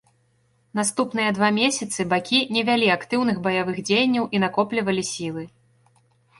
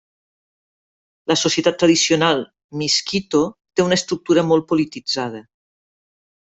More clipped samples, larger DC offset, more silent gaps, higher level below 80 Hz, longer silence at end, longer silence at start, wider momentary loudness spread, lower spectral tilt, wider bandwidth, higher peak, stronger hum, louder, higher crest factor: neither; neither; second, none vs 2.64-2.69 s; about the same, -62 dBFS vs -58 dBFS; second, 0.9 s vs 1.05 s; second, 0.75 s vs 1.3 s; about the same, 9 LU vs 9 LU; about the same, -3.5 dB/octave vs -3.5 dB/octave; first, 11.5 kHz vs 8.2 kHz; second, -6 dBFS vs -2 dBFS; neither; second, -22 LUFS vs -18 LUFS; about the same, 18 dB vs 18 dB